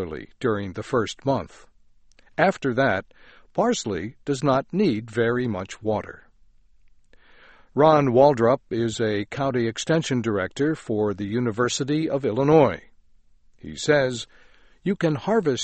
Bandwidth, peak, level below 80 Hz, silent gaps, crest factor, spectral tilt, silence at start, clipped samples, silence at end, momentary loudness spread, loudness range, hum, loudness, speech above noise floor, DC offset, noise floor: 8.8 kHz; -4 dBFS; -54 dBFS; none; 20 dB; -5.5 dB/octave; 0 s; under 0.1%; 0 s; 13 LU; 5 LU; none; -23 LUFS; 32 dB; under 0.1%; -54 dBFS